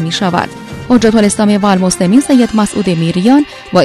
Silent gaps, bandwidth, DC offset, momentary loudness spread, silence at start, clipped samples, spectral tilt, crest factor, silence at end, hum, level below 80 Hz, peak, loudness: none; 13.5 kHz; under 0.1%; 6 LU; 0 s; 0.5%; -5.5 dB/octave; 10 dB; 0 s; none; -40 dBFS; 0 dBFS; -10 LUFS